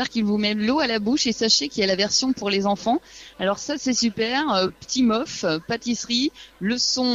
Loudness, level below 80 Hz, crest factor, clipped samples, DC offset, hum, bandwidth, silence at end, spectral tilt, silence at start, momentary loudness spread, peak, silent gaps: -22 LUFS; -56 dBFS; 18 dB; under 0.1%; under 0.1%; none; 7.8 kHz; 0 s; -3 dB/octave; 0 s; 7 LU; -4 dBFS; none